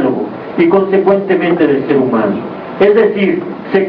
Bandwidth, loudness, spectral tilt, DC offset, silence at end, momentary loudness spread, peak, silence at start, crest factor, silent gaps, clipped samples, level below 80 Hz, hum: 5.4 kHz; -12 LUFS; -9.5 dB/octave; under 0.1%; 0 s; 10 LU; 0 dBFS; 0 s; 12 dB; none; under 0.1%; -52 dBFS; none